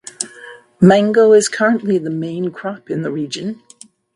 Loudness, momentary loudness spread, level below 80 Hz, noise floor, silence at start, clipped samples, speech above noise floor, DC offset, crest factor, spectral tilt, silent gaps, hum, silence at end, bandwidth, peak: -15 LUFS; 16 LU; -56 dBFS; -45 dBFS; 0.2 s; under 0.1%; 31 dB; under 0.1%; 16 dB; -5.5 dB/octave; none; none; 0.6 s; 11.5 kHz; 0 dBFS